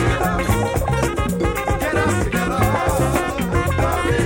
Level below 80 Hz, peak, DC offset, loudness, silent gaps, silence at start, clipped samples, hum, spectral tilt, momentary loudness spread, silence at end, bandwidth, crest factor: -28 dBFS; -4 dBFS; under 0.1%; -19 LUFS; none; 0 s; under 0.1%; none; -5.5 dB/octave; 2 LU; 0 s; 17 kHz; 14 dB